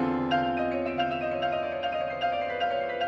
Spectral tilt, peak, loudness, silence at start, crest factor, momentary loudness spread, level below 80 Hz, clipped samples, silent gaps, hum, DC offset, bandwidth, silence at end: -6.5 dB/octave; -14 dBFS; -29 LUFS; 0 s; 14 dB; 3 LU; -56 dBFS; under 0.1%; none; none; under 0.1%; 6.8 kHz; 0 s